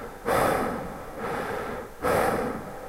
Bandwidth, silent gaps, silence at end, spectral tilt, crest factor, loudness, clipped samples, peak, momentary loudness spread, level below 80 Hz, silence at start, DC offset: 16 kHz; none; 0 s; -5 dB/octave; 18 dB; -28 LUFS; under 0.1%; -10 dBFS; 11 LU; -46 dBFS; 0 s; under 0.1%